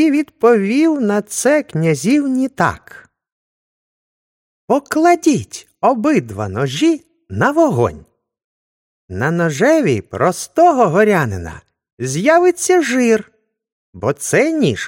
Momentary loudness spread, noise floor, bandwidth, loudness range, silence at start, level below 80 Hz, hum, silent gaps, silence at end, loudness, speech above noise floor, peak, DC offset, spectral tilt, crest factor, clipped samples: 10 LU; under -90 dBFS; 16.5 kHz; 4 LU; 0 s; -50 dBFS; none; 3.32-4.68 s, 8.44-9.08 s, 11.93-11.97 s, 13.72-13.93 s; 0 s; -15 LUFS; over 75 dB; 0 dBFS; under 0.1%; -5.5 dB/octave; 16 dB; under 0.1%